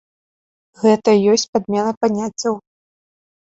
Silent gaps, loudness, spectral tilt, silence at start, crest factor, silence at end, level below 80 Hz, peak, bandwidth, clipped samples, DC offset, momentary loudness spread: 1.49-1.53 s, 1.97-2.01 s; -17 LUFS; -4.5 dB/octave; 0.8 s; 18 dB; 0.9 s; -62 dBFS; -2 dBFS; 8 kHz; under 0.1%; under 0.1%; 9 LU